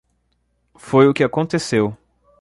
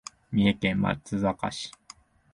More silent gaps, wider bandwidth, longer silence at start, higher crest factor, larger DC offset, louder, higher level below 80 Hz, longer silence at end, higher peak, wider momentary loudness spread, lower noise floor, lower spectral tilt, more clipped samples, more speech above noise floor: neither; about the same, 11.5 kHz vs 11.5 kHz; first, 0.85 s vs 0.3 s; about the same, 18 dB vs 20 dB; neither; first, -17 LUFS vs -27 LUFS; about the same, -56 dBFS vs -52 dBFS; second, 0.45 s vs 0.65 s; first, -2 dBFS vs -10 dBFS; second, 7 LU vs 11 LU; first, -66 dBFS vs -53 dBFS; about the same, -6 dB/octave vs -6 dB/octave; neither; first, 50 dB vs 27 dB